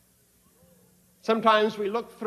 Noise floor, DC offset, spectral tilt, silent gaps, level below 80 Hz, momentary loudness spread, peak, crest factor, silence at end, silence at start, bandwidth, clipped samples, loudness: -63 dBFS; under 0.1%; -5 dB/octave; none; -72 dBFS; 10 LU; -6 dBFS; 22 dB; 0 s; 1.25 s; 14 kHz; under 0.1%; -24 LUFS